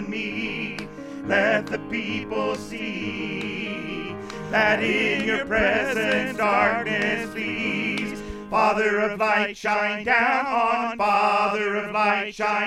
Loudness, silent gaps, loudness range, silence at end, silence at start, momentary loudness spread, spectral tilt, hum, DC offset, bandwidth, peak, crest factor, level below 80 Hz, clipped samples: -23 LUFS; none; 5 LU; 0 s; 0 s; 10 LU; -4.5 dB/octave; none; under 0.1%; 14.5 kHz; -6 dBFS; 18 dB; -50 dBFS; under 0.1%